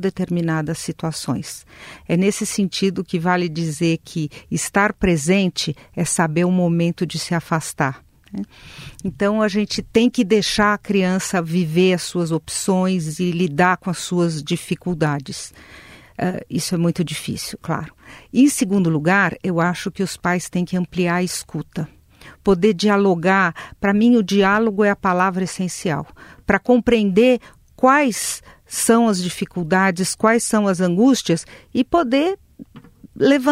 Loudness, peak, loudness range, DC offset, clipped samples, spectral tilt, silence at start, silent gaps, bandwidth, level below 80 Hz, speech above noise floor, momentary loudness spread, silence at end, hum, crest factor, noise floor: -19 LUFS; -2 dBFS; 5 LU; under 0.1%; under 0.1%; -5 dB/octave; 0 s; none; 16 kHz; -48 dBFS; 26 dB; 11 LU; 0 s; none; 18 dB; -45 dBFS